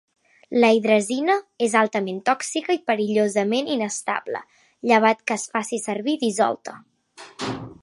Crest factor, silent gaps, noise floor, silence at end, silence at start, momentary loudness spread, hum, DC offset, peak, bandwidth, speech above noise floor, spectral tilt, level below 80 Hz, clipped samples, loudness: 20 dB; none; -47 dBFS; 0.1 s; 0.5 s; 13 LU; none; under 0.1%; -2 dBFS; 11.5 kHz; 25 dB; -4 dB/octave; -66 dBFS; under 0.1%; -22 LUFS